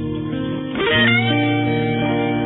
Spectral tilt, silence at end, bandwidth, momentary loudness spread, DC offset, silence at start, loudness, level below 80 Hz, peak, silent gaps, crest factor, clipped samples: -9.5 dB/octave; 0 s; 4.1 kHz; 10 LU; under 0.1%; 0 s; -18 LUFS; -44 dBFS; -4 dBFS; none; 14 dB; under 0.1%